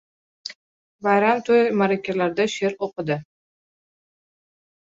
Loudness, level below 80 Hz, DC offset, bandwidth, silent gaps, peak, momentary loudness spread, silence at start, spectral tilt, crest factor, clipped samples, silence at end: -21 LUFS; -68 dBFS; under 0.1%; 7.8 kHz; 0.55-0.99 s; -6 dBFS; 18 LU; 0.45 s; -5.5 dB/octave; 18 dB; under 0.1%; 1.65 s